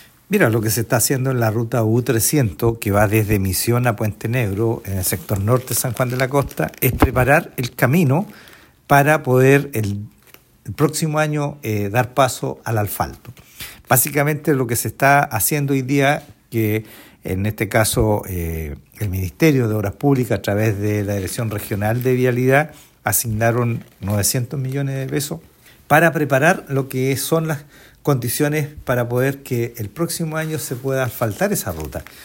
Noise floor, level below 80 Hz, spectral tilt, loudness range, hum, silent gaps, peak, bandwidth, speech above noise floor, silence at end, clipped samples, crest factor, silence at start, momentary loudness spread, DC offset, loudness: -49 dBFS; -40 dBFS; -5.5 dB/octave; 4 LU; none; none; 0 dBFS; 16.5 kHz; 31 dB; 0 s; under 0.1%; 18 dB; 0.3 s; 10 LU; under 0.1%; -19 LUFS